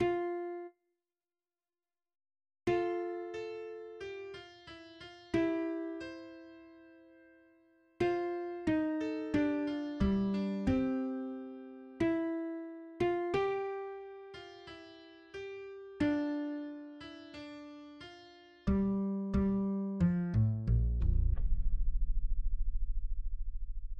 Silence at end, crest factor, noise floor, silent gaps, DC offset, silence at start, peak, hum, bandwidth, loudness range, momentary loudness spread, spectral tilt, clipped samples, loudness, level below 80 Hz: 0 s; 16 dB; under -90 dBFS; none; under 0.1%; 0 s; -20 dBFS; none; 7.4 kHz; 7 LU; 18 LU; -8.5 dB/octave; under 0.1%; -36 LUFS; -40 dBFS